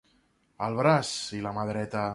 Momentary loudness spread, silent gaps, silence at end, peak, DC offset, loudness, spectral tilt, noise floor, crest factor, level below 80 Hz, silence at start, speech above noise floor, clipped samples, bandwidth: 9 LU; none; 0 s; -8 dBFS; under 0.1%; -28 LUFS; -5 dB/octave; -68 dBFS; 20 dB; -62 dBFS; 0.6 s; 40 dB; under 0.1%; 11.5 kHz